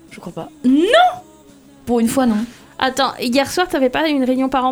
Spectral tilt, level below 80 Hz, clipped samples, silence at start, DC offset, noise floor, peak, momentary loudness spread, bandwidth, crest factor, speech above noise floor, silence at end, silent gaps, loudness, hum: -4 dB/octave; -48 dBFS; under 0.1%; 0.1 s; under 0.1%; -45 dBFS; 0 dBFS; 18 LU; 20 kHz; 16 dB; 29 dB; 0 s; none; -16 LUFS; none